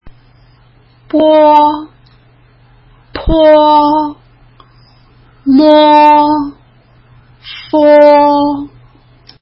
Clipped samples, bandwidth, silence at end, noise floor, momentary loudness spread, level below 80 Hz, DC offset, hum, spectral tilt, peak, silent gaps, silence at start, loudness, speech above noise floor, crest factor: 0.3%; 5.8 kHz; 0.75 s; -45 dBFS; 18 LU; -32 dBFS; under 0.1%; none; -7.5 dB/octave; 0 dBFS; none; 0.05 s; -8 LUFS; 38 dB; 10 dB